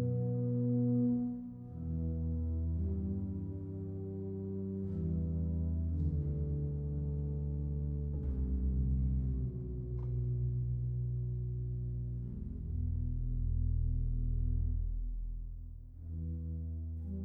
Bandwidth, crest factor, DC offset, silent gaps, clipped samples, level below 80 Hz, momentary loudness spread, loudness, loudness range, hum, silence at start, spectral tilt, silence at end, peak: 1.6 kHz; 12 dB; under 0.1%; none; under 0.1%; -40 dBFS; 8 LU; -37 LUFS; 2 LU; none; 0 s; -14 dB/octave; 0 s; -24 dBFS